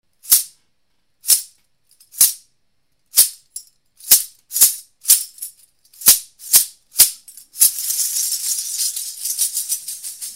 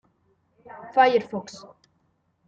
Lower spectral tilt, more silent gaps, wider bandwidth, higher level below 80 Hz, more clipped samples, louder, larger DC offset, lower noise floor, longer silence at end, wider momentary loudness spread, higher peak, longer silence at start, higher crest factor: second, 3 dB/octave vs -4.5 dB/octave; neither; first, over 20 kHz vs 7.8 kHz; first, -60 dBFS vs -74 dBFS; neither; first, -15 LUFS vs -22 LUFS; neither; about the same, -70 dBFS vs -69 dBFS; second, 0 s vs 0.9 s; second, 19 LU vs 24 LU; first, 0 dBFS vs -6 dBFS; second, 0.25 s vs 0.75 s; about the same, 20 dB vs 20 dB